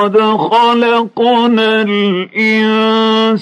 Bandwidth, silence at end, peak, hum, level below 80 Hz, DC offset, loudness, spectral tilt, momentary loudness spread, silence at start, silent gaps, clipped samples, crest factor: 8.8 kHz; 0 s; -2 dBFS; none; -66 dBFS; under 0.1%; -11 LUFS; -6 dB/octave; 3 LU; 0 s; none; under 0.1%; 8 dB